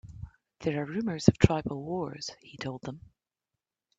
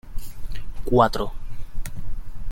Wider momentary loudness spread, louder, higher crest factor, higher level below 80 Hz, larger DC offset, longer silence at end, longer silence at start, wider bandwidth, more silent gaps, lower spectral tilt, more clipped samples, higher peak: about the same, 23 LU vs 21 LU; second, -30 LUFS vs -22 LUFS; first, 28 dB vs 18 dB; second, -48 dBFS vs -30 dBFS; neither; first, 1 s vs 0 s; about the same, 0.05 s vs 0.05 s; second, 8 kHz vs 16 kHz; neither; about the same, -6.5 dB/octave vs -6.5 dB/octave; neither; about the same, -2 dBFS vs -4 dBFS